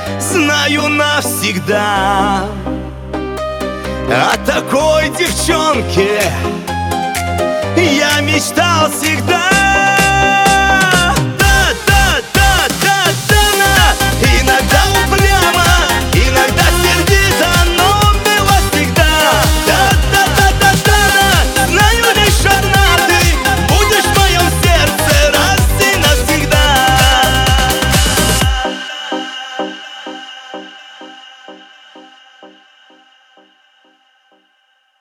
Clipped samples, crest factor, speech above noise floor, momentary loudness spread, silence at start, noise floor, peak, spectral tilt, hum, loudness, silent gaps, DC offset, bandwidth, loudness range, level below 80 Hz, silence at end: under 0.1%; 12 dB; 45 dB; 11 LU; 0 s; -58 dBFS; 0 dBFS; -3.5 dB/octave; none; -11 LUFS; none; under 0.1%; 19 kHz; 6 LU; -20 dBFS; 2.55 s